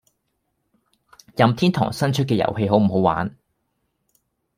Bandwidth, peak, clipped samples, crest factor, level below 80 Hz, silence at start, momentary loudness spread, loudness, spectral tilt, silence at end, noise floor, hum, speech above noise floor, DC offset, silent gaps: 16 kHz; -2 dBFS; under 0.1%; 20 dB; -54 dBFS; 1.35 s; 8 LU; -20 LUFS; -7 dB/octave; 1.3 s; -73 dBFS; none; 54 dB; under 0.1%; none